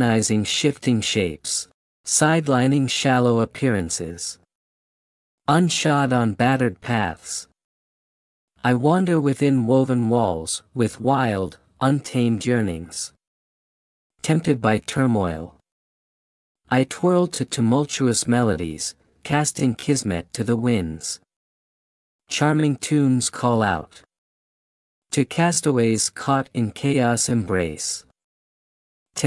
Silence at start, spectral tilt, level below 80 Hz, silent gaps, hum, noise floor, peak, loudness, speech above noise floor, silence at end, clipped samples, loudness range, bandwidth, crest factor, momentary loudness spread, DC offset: 0 s; -5 dB/octave; -56 dBFS; 1.74-2.04 s, 4.55-5.38 s, 7.64-8.48 s, 13.27-14.10 s, 15.72-16.55 s, 21.36-22.19 s, 24.18-25.02 s, 28.24-29.06 s; none; under -90 dBFS; -4 dBFS; -21 LUFS; over 70 dB; 0 s; under 0.1%; 4 LU; 12 kHz; 18 dB; 11 LU; under 0.1%